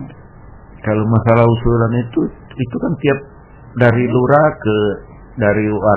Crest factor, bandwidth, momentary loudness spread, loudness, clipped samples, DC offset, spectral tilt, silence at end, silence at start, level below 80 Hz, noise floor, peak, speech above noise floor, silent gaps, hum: 16 dB; 4 kHz; 13 LU; -15 LUFS; 0.1%; under 0.1%; -12 dB/octave; 0 s; 0 s; -36 dBFS; -38 dBFS; 0 dBFS; 24 dB; none; none